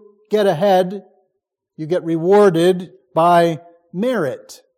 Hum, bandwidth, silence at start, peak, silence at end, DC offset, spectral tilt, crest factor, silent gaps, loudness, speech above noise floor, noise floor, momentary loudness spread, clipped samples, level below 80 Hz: none; 15.5 kHz; 0.3 s; -2 dBFS; 0.25 s; under 0.1%; -6.5 dB/octave; 16 dB; none; -16 LUFS; 60 dB; -75 dBFS; 19 LU; under 0.1%; -70 dBFS